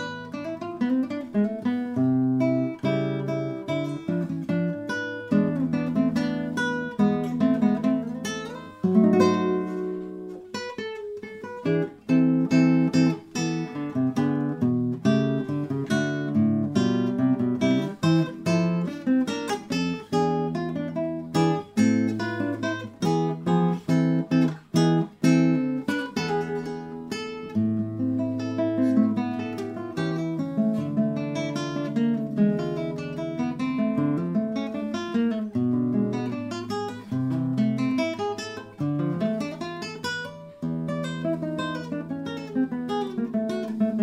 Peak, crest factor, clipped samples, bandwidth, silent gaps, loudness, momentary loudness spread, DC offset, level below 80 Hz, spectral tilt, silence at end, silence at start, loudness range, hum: -6 dBFS; 18 dB; under 0.1%; 11.5 kHz; none; -26 LUFS; 10 LU; under 0.1%; -64 dBFS; -7 dB/octave; 0 s; 0 s; 4 LU; none